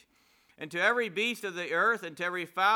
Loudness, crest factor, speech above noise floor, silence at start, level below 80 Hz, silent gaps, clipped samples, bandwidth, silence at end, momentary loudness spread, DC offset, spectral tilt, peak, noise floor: -29 LUFS; 18 dB; 37 dB; 0.6 s; -84 dBFS; none; under 0.1%; 19 kHz; 0 s; 8 LU; under 0.1%; -3 dB/octave; -12 dBFS; -66 dBFS